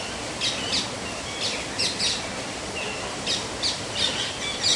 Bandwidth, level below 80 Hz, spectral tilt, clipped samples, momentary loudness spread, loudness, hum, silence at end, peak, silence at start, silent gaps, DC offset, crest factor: 11.5 kHz; -50 dBFS; -1.5 dB/octave; under 0.1%; 7 LU; -26 LUFS; none; 0 s; -8 dBFS; 0 s; none; under 0.1%; 20 dB